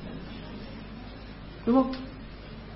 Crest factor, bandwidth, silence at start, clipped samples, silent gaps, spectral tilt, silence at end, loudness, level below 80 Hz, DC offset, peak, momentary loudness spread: 20 dB; 5.8 kHz; 0 s; under 0.1%; none; -10.5 dB/octave; 0 s; -30 LUFS; -46 dBFS; under 0.1%; -12 dBFS; 19 LU